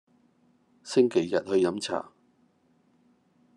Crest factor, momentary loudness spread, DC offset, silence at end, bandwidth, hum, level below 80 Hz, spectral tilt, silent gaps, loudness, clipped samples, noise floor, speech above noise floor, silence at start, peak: 20 dB; 18 LU; under 0.1%; 1.55 s; 11 kHz; none; -78 dBFS; -5 dB/octave; none; -27 LUFS; under 0.1%; -66 dBFS; 41 dB; 0.85 s; -10 dBFS